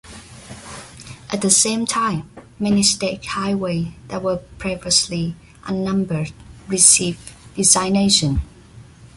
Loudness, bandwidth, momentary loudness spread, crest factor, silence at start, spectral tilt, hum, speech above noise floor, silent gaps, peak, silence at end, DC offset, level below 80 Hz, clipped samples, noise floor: -17 LUFS; 12 kHz; 22 LU; 20 dB; 0.05 s; -3 dB/octave; none; 24 dB; none; 0 dBFS; 0.1 s; under 0.1%; -40 dBFS; under 0.1%; -43 dBFS